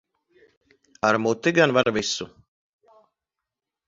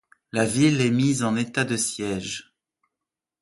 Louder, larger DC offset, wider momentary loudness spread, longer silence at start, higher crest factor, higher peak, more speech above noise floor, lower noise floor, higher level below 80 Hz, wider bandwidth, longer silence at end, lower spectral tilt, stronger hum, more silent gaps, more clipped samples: about the same, -22 LUFS vs -23 LUFS; neither; about the same, 10 LU vs 11 LU; first, 1.05 s vs 0.35 s; first, 24 dB vs 18 dB; first, -2 dBFS vs -6 dBFS; about the same, 65 dB vs 64 dB; about the same, -86 dBFS vs -87 dBFS; about the same, -62 dBFS vs -58 dBFS; second, 7.8 kHz vs 11.5 kHz; first, 1.6 s vs 1 s; about the same, -4 dB/octave vs -4.5 dB/octave; neither; neither; neither